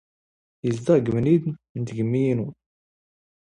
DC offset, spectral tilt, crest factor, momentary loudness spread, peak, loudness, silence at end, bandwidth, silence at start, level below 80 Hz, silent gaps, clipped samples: under 0.1%; -8.5 dB/octave; 18 dB; 11 LU; -6 dBFS; -23 LUFS; 0.9 s; 10.5 kHz; 0.65 s; -58 dBFS; 1.69-1.75 s; under 0.1%